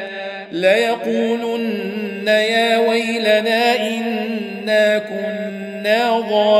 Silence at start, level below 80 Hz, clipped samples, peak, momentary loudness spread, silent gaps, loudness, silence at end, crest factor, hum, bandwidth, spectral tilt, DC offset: 0 s; -70 dBFS; under 0.1%; -2 dBFS; 9 LU; none; -18 LUFS; 0 s; 16 dB; none; 15.5 kHz; -4 dB/octave; under 0.1%